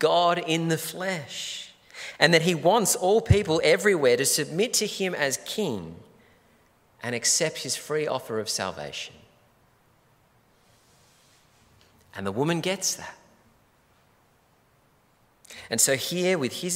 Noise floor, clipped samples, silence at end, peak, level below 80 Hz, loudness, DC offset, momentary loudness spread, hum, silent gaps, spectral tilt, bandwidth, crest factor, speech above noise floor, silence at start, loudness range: -63 dBFS; under 0.1%; 0 s; 0 dBFS; -52 dBFS; -24 LUFS; under 0.1%; 16 LU; none; none; -3 dB/octave; 16 kHz; 26 dB; 38 dB; 0 s; 13 LU